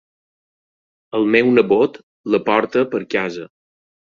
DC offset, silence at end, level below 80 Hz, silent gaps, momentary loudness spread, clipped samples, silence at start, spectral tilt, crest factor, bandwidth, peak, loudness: under 0.1%; 0.65 s; -60 dBFS; 2.03-2.24 s; 12 LU; under 0.1%; 1.15 s; -6.5 dB/octave; 18 dB; 7.2 kHz; -2 dBFS; -17 LUFS